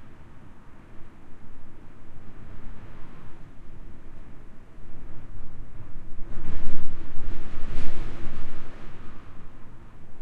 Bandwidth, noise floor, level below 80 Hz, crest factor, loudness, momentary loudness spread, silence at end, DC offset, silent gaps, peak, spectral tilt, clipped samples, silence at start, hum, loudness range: 2.9 kHz; -40 dBFS; -34 dBFS; 16 dB; -44 LUFS; 13 LU; 0 s; under 0.1%; none; -2 dBFS; -7 dB/octave; under 0.1%; 0 s; none; 9 LU